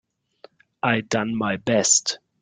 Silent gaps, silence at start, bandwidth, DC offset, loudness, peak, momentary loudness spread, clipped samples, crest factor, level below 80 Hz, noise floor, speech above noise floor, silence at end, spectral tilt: none; 0.85 s; 10 kHz; under 0.1%; -21 LUFS; -4 dBFS; 9 LU; under 0.1%; 20 dB; -62 dBFS; -52 dBFS; 30 dB; 0.25 s; -2.5 dB/octave